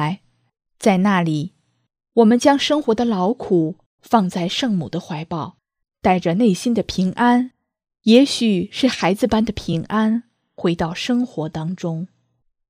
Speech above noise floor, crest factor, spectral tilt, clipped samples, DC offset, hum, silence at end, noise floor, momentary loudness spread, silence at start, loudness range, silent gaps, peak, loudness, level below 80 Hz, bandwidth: 49 dB; 20 dB; -6 dB/octave; under 0.1%; under 0.1%; none; 0.65 s; -67 dBFS; 12 LU; 0 s; 4 LU; 3.86-3.98 s; 0 dBFS; -19 LUFS; -50 dBFS; 14.5 kHz